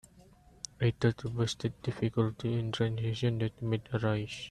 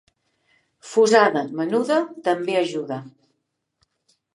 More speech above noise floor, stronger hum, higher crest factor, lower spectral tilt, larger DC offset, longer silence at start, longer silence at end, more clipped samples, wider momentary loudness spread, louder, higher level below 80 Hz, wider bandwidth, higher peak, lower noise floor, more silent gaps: second, 27 dB vs 56 dB; neither; about the same, 18 dB vs 22 dB; first, -6.5 dB/octave vs -4.5 dB/octave; neither; second, 0.15 s vs 0.85 s; second, 0 s vs 1.25 s; neither; second, 4 LU vs 13 LU; second, -33 LUFS vs -21 LUFS; first, -58 dBFS vs -78 dBFS; second, 10 kHz vs 11.5 kHz; second, -14 dBFS vs -2 dBFS; second, -59 dBFS vs -76 dBFS; neither